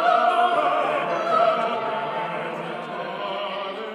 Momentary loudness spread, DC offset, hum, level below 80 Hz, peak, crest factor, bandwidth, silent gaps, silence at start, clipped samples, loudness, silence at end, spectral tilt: 11 LU; under 0.1%; none; -74 dBFS; -8 dBFS; 16 dB; 10.5 kHz; none; 0 s; under 0.1%; -23 LUFS; 0 s; -5 dB/octave